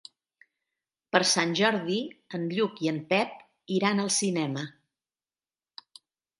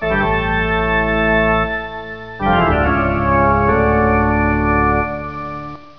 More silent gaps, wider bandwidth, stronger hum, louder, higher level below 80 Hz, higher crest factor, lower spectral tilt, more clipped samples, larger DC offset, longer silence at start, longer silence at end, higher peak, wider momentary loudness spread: neither; first, 11.5 kHz vs 5.4 kHz; neither; second, -27 LUFS vs -16 LUFS; second, -78 dBFS vs -26 dBFS; first, 26 dB vs 14 dB; second, -3.5 dB/octave vs -9 dB/octave; neither; second, under 0.1% vs 0.6%; first, 1.15 s vs 0 s; first, 1.7 s vs 0.15 s; about the same, -4 dBFS vs -2 dBFS; about the same, 13 LU vs 12 LU